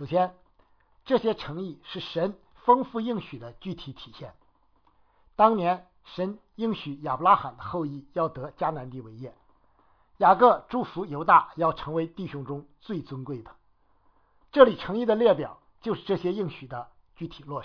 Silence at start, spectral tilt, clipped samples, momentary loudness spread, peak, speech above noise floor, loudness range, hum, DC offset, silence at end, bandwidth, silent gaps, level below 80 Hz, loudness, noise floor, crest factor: 0 s; -8.5 dB/octave; under 0.1%; 21 LU; -2 dBFS; 40 dB; 5 LU; none; under 0.1%; 0 s; 5.4 kHz; none; -58 dBFS; -26 LUFS; -66 dBFS; 24 dB